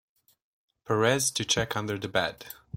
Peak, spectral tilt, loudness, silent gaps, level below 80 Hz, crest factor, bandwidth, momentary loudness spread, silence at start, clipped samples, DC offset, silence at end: -8 dBFS; -3 dB/octave; -27 LUFS; none; -60 dBFS; 22 dB; 16.5 kHz; 8 LU; 0.9 s; under 0.1%; under 0.1%; 0 s